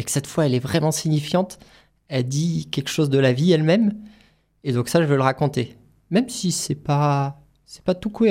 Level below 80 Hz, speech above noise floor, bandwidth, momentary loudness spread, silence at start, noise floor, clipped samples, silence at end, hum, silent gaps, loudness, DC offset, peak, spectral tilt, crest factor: -56 dBFS; 36 dB; 16 kHz; 10 LU; 0 s; -57 dBFS; under 0.1%; 0 s; none; none; -21 LUFS; under 0.1%; -4 dBFS; -5.5 dB/octave; 18 dB